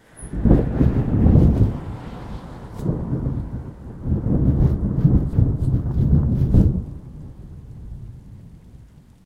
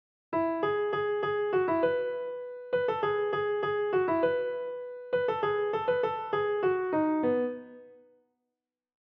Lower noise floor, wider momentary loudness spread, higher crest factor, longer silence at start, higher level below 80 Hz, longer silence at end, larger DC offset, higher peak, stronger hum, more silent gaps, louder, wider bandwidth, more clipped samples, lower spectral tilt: second, -46 dBFS vs -88 dBFS; first, 21 LU vs 8 LU; first, 20 dB vs 14 dB; about the same, 0.2 s vs 0.3 s; first, -26 dBFS vs -70 dBFS; second, 0.5 s vs 1.1 s; neither; first, 0 dBFS vs -16 dBFS; neither; neither; first, -20 LUFS vs -29 LUFS; first, 11 kHz vs 5.4 kHz; neither; first, -10.5 dB/octave vs -8 dB/octave